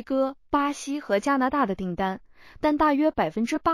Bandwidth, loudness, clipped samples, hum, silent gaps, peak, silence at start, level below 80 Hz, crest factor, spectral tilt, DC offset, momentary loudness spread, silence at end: 15 kHz; -25 LUFS; under 0.1%; none; none; -10 dBFS; 0 s; -50 dBFS; 16 dB; -5.5 dB/octave; under 0.1%; 8 LU; 0 s